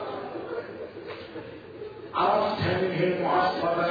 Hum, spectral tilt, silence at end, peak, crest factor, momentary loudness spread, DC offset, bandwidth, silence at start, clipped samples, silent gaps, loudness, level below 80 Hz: none; -7.5 dB/octave; 0 s; -12 dBFS; 16 dB; 17 LU; under 0.1%; 5 kHz; 0 s; under 0.1%; none; -27 LUFS; -60 dBFS